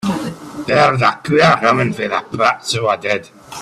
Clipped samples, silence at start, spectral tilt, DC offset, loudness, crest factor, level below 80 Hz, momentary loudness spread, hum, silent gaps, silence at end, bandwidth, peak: under 0.1%; 0.05 s; -5 dB/octave; under 0.1%; -15 LUFS; 16 dB; -52 dBFS; 12 LU; none; none; 0 s; 14 kHz; 0 dBFS